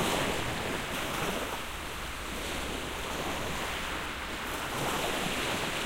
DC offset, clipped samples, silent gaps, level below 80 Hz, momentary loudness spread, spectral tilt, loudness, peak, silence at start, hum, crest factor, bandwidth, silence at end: under 0.1%; under 0.1%; none; -46 dBFS; 6 LU; -3 dB/octave; -33 LUFS; -18 dBFS; 0 s; none; 16 dB; 16 kHz; 0 s